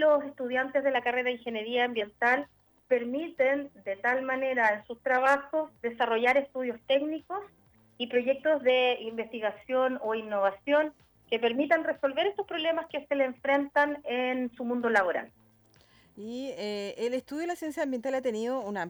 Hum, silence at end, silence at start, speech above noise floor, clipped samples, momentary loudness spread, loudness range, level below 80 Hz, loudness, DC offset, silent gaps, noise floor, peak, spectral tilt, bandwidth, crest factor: none; 0 s; 0 s; 33 dB; under 0.1%; 9 LU; 4 LU; -72 dBFS; -29 LUFS; under 0.1%; none; -62 dBFS; -8 dBFS; -4 dB/octave; over 20 kHz; 20 dB